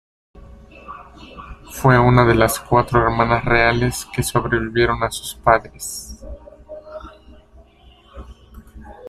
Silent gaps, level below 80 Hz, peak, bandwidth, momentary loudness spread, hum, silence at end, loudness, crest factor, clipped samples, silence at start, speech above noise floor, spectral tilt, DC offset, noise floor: none; -36 dBFS; 0 dBFS; 15.5 kHz; 24 LU; none; 0 s; -17 LUFS; 20 dB; under 0.1%; 0.35 s; 32 dB; -5.5 dB/octave; under 0.1%; -49 dBFS